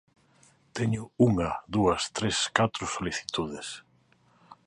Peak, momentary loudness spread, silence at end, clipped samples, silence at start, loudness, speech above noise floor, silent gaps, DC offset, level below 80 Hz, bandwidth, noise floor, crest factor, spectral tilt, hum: -6 dBFS; 13 LU; 0.15 s; under 0.1%; 0.75 s; -28 LUFS; 36 dB; none; under 0.1%; -52 dBFS; 11.5 kHz; -64 dBFS; 24 dB; -4.5 dB/octave; none